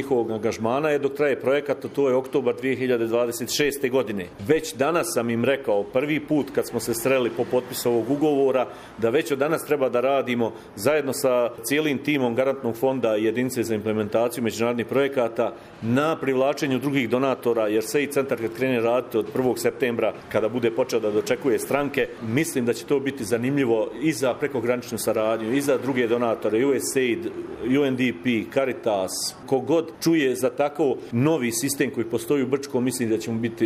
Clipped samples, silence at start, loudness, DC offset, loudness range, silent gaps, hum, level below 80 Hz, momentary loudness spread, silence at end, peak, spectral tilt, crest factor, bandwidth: under 0.1%; 0 s; -24 LUFS; under 0.1%; 1 LU; none; none; -60 dBFS; 4 LU; 0 s; -6 dBFS; -5 dB/octave; 18 dB; 15.5 kHz